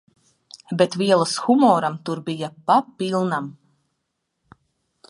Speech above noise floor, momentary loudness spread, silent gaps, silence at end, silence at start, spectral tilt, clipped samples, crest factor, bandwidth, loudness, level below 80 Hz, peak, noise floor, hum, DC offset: 56 dB; 12 LU; none; 1.55 s; 0.7 s; -5.5 dB/octave; under 0.1%; 20 dB; 11.5 kHz; -21 LUFS; -72 dBFS; -2 dBFS; -76 dBFS; none; under 0.1%